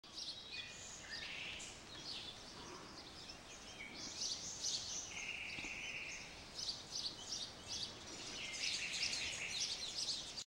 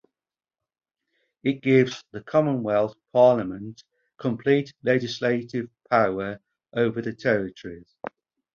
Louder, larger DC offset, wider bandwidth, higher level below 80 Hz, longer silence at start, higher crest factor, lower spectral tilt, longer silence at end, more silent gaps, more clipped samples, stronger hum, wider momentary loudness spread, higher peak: second, -44 LUFS vs -24 LUFS; neither; first, 16 kHz vs 7.2 kHz; second, -68 dBFS vs -62 dBFS; second, 0.05 s vs 1.45 s; about the same, 20 dB vs 20 dB; second, 0 dB/octave vs -7 dB/octave; second, 0.1 s vs 0.45 s; neither; neither; neither; second, 12 LU vs 20 LU; second, -26 dBFS vs -6 dBFS